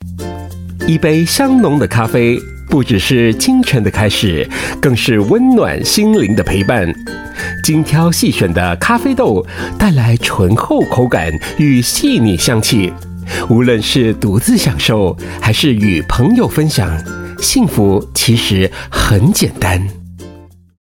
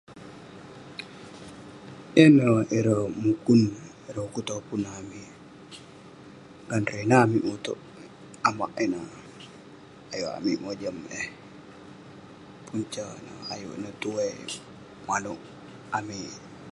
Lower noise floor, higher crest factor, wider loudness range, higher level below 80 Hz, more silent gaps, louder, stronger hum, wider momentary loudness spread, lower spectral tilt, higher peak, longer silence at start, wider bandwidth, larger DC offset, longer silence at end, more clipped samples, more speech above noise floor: second, -37 dBFS vs -48 dBFS; second, 12 dB vs 26 dB; second, 1 LU vs 12 LU; first, -30 dBFS vs -62 dBFS; neither; first, -12 LUFS vs -26 LUFS; neither; second, 9 LU vs 26 LU; about the same, -5 dB/octave vs -6 dB/octave; about the same, 0 dBFS vs -2 dBFS; about the same, 0 s vs 0.1 s; first, 17 kHz vs 11.5 kHz; neither; first, 0.35 s vs 0.05 s; neither; about the same, 26 dB vs 23 dB